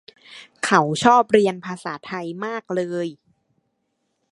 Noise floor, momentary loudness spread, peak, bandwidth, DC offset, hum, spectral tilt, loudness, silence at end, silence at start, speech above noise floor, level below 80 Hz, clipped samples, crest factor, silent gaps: -73 dBFS; 15 LU; 0 dBFS; 11.5 kHz; under 0.1%; none; -5 dB/octave; -21 LUFS; 1.2 s; 0.3 s; 53 dB; -64 dBFS; under 0.1%; 22 dB; none